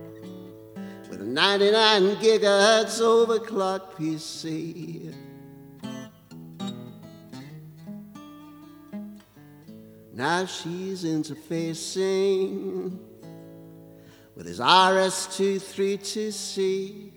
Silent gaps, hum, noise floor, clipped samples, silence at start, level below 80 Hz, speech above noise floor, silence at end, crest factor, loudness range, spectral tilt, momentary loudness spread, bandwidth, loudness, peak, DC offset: none; none; -50 dBFS; under 0.1%; 0 s; -70 dBFS; 26 dB; 0.05 s; 26 dB; 20 LU; -3.5 dB/octave; 25 LU; over 20 kHz; -23 LUFS; 0 dBFS; under 0.1%